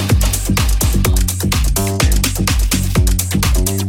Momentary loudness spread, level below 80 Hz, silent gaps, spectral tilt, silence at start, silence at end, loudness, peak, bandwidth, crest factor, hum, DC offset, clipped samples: 2 LU; -16 dBFS; none; -4 dB/octave; 0 s; 0 s; -15 LUFS; 0 dBFS; 18.5 kHz; 14 dB; none; under 0.1%; under 0.1%